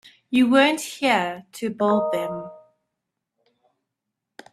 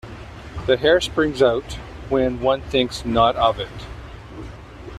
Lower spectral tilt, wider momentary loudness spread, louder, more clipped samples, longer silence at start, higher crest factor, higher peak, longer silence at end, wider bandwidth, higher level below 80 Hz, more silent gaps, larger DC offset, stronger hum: about the same, -4 dB/octave vs -5 dB/octave; second, 14 LU vs 21 LU; about the same, -21 LUFS vs -20 LUFS; neither; first, 0.3 s vs 0.05 s; about the same, 22 dB vs 18 dB; about the same, -2 dBFS vs -4 dBFS; first, 1.95 s vs 0 s; about the same, 14 kHz vs 13.5 kHz; second, -68 dBFS vs -38 dBFS; neither; neither; neither